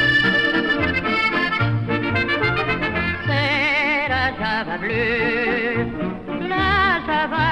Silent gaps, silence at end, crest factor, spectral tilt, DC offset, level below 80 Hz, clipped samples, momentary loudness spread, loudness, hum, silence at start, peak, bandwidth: none; 0 s; 14 dB; -6.5 dB/octave; 0.3%; -40 dBFS; under 0.1%; 6 LU; -19 LUFS; none; 0 s; -6 dBFS; 11 kHz